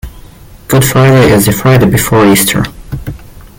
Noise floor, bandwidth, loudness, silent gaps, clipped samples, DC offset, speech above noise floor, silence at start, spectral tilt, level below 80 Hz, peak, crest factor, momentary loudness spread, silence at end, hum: -33 dBFS; 17.5 kHz; -7 LUFS; none; under 0.1%; under 0.1%; 26 dB; 0.05 s; -5 dB/octave; -28 dBFS; 0 dBFS; 8 dB; 17 LU; 0.2 s; none